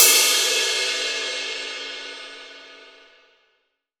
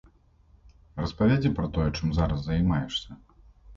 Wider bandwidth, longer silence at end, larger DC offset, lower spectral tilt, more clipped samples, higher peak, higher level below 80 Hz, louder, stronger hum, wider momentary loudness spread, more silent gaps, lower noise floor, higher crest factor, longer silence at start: first, over 20 kHz vs 7.6 kHz; first, 1.15 s vs 0 s; neither; second, 4 dB/octave vs -7.5 dB/octave; neither; first, 0 dBFS vs -12 dBFS; second, -74 dBFS vs -38 dBFS; first, -19 LUFS vs -27 LUFS; neither; first, 23 LU vs 11 LU; neither; first, -71 dBFS vs -59 dBFS; first, 24 dB vs 16 dB; second, 0 s vs 0.95 s